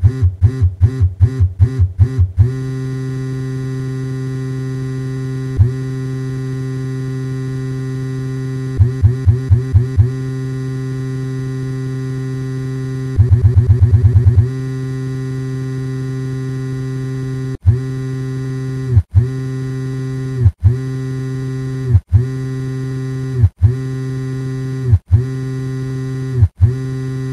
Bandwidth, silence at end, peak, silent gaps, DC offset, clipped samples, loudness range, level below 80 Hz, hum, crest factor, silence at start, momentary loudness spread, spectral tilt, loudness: 10.5 kHz; 0 s; 0 dBFS; none; under 0.1%; under 0.1%; 6 LU; -32 dBFS; none; 16 dB; 0 s; 8 LU; -8.5 dB/octave; -17 LUFS